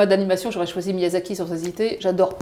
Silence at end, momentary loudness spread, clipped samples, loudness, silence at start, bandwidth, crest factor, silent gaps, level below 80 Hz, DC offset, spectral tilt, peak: 0 s; 7 LU; under 0.1%; -23 LUFS; 0 s; 15.5 kHz; 16 dB; none; -58 dBFS; under 0.1%; -5.5 dB/octave; -6 dBFS